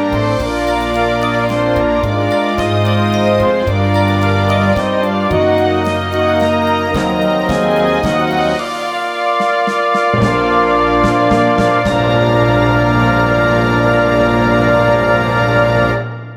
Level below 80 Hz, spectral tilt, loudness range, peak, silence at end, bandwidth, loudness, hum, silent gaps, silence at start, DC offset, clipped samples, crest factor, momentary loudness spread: -32 dBFS; -6.5 dB/octave; 2 LU; 0 dBFS; 0 s; 16 kHz; -13 LUFS; none; none; 0 s; under 0.1%; under 0.1%; 12 dB; 4 LU